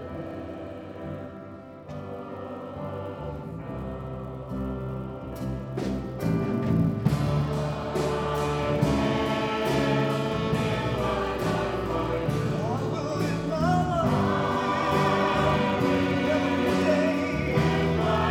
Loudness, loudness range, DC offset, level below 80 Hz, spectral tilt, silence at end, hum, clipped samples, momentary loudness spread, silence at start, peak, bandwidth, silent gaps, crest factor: -27 LUFS; 12 LU; under 0.1%; -42 dBFS; -7 dB/octave; 0 s; none; under 0.1%; 13 LU; 0 s; -10 dBFS; 16 kHz; none; 16 dB